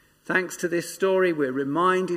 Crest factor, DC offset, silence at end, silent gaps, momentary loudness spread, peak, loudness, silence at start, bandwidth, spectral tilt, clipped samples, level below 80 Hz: 16 dB; under 0.1%; 0 s; none; 5 LU; -8 dBFS; -24 LUFS; 0.3 s; 15.5 kHz; -5 dB/octave; under 0.1%; -72 dBFS